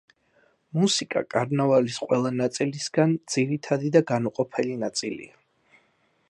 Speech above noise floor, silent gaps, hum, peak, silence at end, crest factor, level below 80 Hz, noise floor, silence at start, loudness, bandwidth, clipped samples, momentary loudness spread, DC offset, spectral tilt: 43 dB; none; none; -6 dBFS; 1.05 s; 20 dB; -70 dBFS; -67 dBFS; 0.75 s; -25 LUFS; 11.5 kHz; under 0.1%; 7 LU; under 0.1%; -5 dB/octave